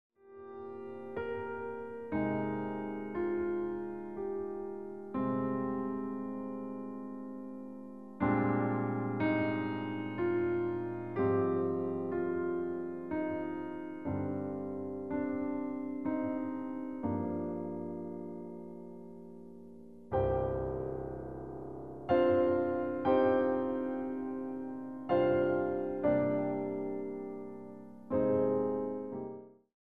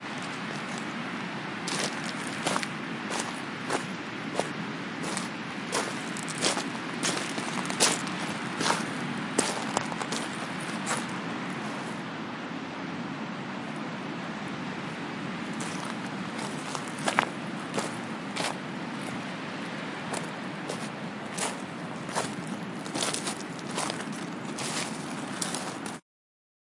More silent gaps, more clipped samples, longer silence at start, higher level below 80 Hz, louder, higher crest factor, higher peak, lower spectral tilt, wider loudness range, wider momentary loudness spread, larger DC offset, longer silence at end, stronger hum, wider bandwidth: neither; neither; about the same, 0.1 s vs 0 s; first, -60 dBFS vs -74 dBFS; second, -35 LUFS vs -32 LUFS; second, 18 dB vs 32 dB; second, -16 dBFS vs -2 dBFS; first, -10 dB/octave vs -3 dB/octave; about the same, 7 LU vs 6 LU; first, 15 LU vs 8 LU; first, 0.1% vs under 0.1%; second, 0.05 s vs 0.75 s; neither; second, 4.9 kHz vs 11.5 kHz